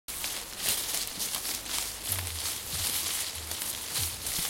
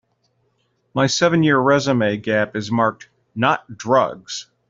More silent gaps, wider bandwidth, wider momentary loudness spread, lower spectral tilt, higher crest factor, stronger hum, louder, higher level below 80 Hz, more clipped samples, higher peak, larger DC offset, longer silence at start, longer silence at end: neither; first, 17 kHz vs 7.8 kHz; second, 5 LU vs 11 LU; second, -0.5 dB/octave vs -5 dB/octave; first, 26 dB vs 18 dB; neither; second, -30 LUFS vs -18 LUFS; about the same, -54 dBFS vs -58 dBFS; neither; second, -8 dBFS vs -2 dBFS; neither; second, 0.1 s vs 0.95 s; second, 0 s vs 0.25 s